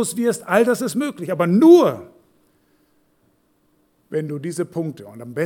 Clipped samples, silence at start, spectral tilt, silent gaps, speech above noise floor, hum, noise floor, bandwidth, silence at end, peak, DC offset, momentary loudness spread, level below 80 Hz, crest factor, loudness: under 0.1%; 0 s; -6 dB/octave; none; 45 dB; none; -62 dBFS; 17 kHz; 0 s; -2 dBFS; under 0.1%; 18 LU; -72 dBFS; 18 dB; -18 LUFS